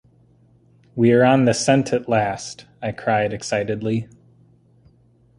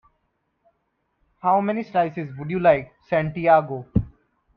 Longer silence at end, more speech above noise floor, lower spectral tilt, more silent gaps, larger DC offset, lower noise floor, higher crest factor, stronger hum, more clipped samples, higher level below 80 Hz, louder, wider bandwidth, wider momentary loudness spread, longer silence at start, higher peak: first, 1.35 s vs 0.5 s; second, 37 dB vs 52 dB; second, -5.5 dB/octave vs -10 dB/octave; neither; neither; second, -56 dBFS vs -73 dBFS; about the same, 18 dB vs 20 dB; neither; neither; second, -56 dBFS vs -44 dBFS; about the same, -20 LUFS vs -22 LUFS; first, 11.5 kHz vs 5.6 kHz; first, 16 LU vs 9 LU; second, 0.95 s vs 1.45 s; about the same, -2 dBFS vs -4 dBFS